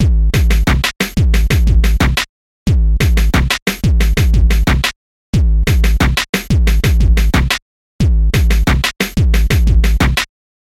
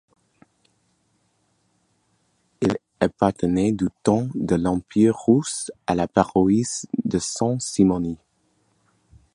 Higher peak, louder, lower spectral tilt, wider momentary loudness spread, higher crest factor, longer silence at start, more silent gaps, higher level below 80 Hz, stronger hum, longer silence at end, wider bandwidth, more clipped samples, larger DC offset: about the same, -2 dBFS vs 0 dBFS; first, -14 LUFS vs -22 LUFS; about the same, -5 dB/octave vs -6 dB/octave; second, 4 LU vs 7 LU; second, 10 dB vs 22 dB; second, 0 s vs 2.6 s; first, 2.29-2.66 s, 3.62-3.66 s, 4.96-5.33 s, 6.29-6.33 s, 7.62-7.99 s vs none; first, -14 dBFS vs -50 dBFS; neither; second, 0.4 s vs 1.2 s; first, 16 kHz vs 11.5 kHz; neither; neither